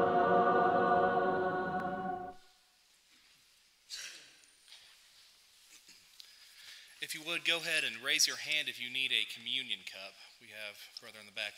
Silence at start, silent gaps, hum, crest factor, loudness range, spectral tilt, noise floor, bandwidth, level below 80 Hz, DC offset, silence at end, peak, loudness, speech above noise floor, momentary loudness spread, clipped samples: 0 s; none; none; 22 dB; 19 LU; -2.5 dB/octave; -68 dBFS; 16 kHz; -72 dBFS; under 0.1%; 0 s; -14 dBFS; -32 LUFS; 31 dB; 23 LU; under 0.1%